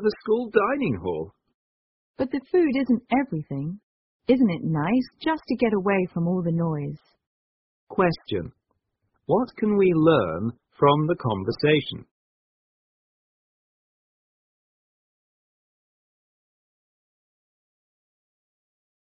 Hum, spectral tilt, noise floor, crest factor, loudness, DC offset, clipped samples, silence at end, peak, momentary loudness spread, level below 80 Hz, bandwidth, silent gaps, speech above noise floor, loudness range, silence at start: none; -6 dB/octave; -75 dBFS; 20 dB; -24 LUFS; under 0.1%; under 0.1%; 7.1 s; -6 dBFS; 13 LU; -58 dBFS; 5.6 kHz; 1.54-2.14 s, 3.83-4.20 s, 7.26-7.87 s; 52 dB; 6 LU; 0 s